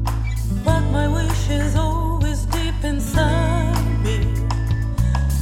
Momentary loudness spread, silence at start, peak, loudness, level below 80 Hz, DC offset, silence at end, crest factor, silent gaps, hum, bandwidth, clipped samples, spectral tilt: 4 LU; 0 s; -4 dBFS; -21 LUFS; -22 dBFS; under 0.1%; 0 s; 14 dB; none; none; 15.5 kHz; under 0.1%; -6 dB/octave